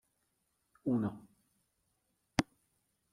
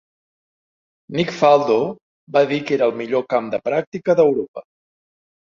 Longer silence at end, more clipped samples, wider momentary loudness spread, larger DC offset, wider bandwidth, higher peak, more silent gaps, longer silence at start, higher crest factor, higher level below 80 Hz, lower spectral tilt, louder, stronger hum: second, 0.7 s vs 0.95 s; neither; about the same, 13 LU vs 12 LU; neither; first, 13.5 kHz vs 7.4 kHz; second, -14 dBFS vs -2 dBFS; second, none vs 2.02-2.27 s, 3.87-3.92 s, 4.48-4.54 s; second, 0.85 s vs 1.1 s; first, 28 dB vs 18 dB; about the same, -66 dBFS vs -64 dBFS; about the same, -5.5 dB/octave vs -6.5 dB/octave; second, -37 LUFS vs -19 LUFS; neither